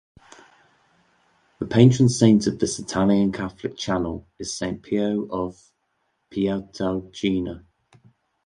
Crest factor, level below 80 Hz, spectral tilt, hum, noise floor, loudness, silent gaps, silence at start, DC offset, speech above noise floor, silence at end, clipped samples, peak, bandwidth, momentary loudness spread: 22 dB; -50 dBFS; -6 dB/octave; none; -72 dBFS; -22 LUFS; none; 1.6 s; under 0.1%; 51 dB; 0.85 s; under 0.1%; -2 dBFS; 11 kHz; 16 LU